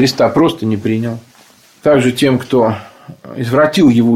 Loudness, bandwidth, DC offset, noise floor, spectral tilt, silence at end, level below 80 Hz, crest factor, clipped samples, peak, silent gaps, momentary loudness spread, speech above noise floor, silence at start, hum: -13 LUFS; 15.5 kHz; under 0.1%; -46 dBFS; -6 dB/octave; 0 s; -48 dBFS; 12 dB; under 0.1%; 0 dBFS; none; 13 LU; 33 dB; 0 s; none